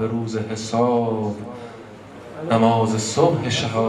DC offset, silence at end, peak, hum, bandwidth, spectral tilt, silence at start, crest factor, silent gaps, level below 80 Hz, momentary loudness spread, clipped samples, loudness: under 0.1%; 0 s; -4 dBFS; none; 12 kHz; -5.5 dB/octave; 0 s; 16 dB; none; -56 dBFS; 20 LU; under 0.1%; -20 LUFS